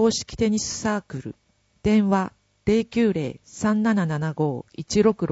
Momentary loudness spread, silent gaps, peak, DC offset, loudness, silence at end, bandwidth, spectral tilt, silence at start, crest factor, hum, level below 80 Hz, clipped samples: 12 LU; none; -6 dBFS; under 0.1%; -23 LUFS; 0 s; 8 kHz; -5.5 dB/octave; 0 s; 16 dB; none; -48 dBFS; under 0.1%